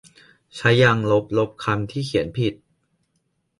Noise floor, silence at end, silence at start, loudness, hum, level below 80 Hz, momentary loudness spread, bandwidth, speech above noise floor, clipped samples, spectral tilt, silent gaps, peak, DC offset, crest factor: -71 dBFS; 1.05 s; 0.55 s; -21 LUFS; none; -52 dBFS; 9 LU; 11.5 kHz; 51 dB; under 0.1%; -6.5 dB/octave; none; -2 dBFS; under 0.1%; 20 dB